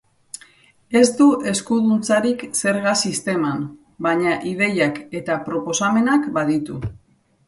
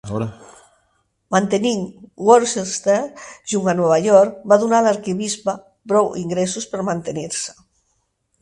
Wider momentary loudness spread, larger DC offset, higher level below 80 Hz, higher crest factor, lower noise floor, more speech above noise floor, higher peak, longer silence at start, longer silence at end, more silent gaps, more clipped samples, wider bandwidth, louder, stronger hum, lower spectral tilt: about the same, 14 LU vs 12 LU; neither; about the same, -54 dBFS vs -58 dBFS; about the same, 18 dB vs 20 dB; second, -52 dBFS vs -68 dBFS; second, 33 dB vs 50 dB; about the same, -2 dBFS vs 0 dBFS; first, 0.9 s vs 0.05 s; second, 0.55 s vs 0.9 s; neither; neither; about the same, 11.5 kHz vs 11.5 kHz; about the same, -19 LUFS vs -18 LUFS; neither; about the same, -4.5 dB/octave vs -4.5 dB/octave